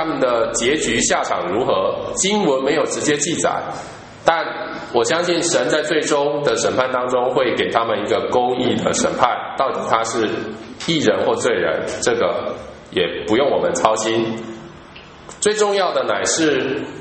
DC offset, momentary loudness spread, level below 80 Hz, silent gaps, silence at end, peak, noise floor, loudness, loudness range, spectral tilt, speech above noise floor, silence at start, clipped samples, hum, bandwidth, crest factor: under 0.1%; 9 LU; -50 dBFS; none; 0 s; 0 dBFS; -40 dBFS; -18 LUFS; 2 LU; -3 dB/octave; 21 dB; 0 s; under 0.1%; none; 8.8 kHz; 18 dB